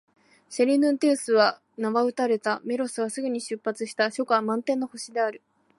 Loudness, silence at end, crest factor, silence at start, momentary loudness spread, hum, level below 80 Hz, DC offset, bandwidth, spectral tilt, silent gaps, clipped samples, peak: -25 LUFS; 0.4 s; 20 dB; 0.5 s; 9 LU; none; -82 dBFS; under 0.1%; 11.5 kHz; -3.5 dB/octave; none; under 0.1%; -6 dBFS